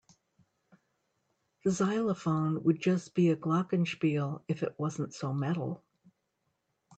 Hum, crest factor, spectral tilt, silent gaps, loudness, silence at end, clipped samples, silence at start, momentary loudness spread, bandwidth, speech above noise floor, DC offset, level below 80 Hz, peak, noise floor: none; 18 dB; -7 dB/octave; none; -31 LUFS; 1.2 s; under 0.1%; 1.65 s; 7 LU; 8.8 kHz; 50 dB; under 0.1%; -74 dBFS; -14 dBFS; -80 dBFS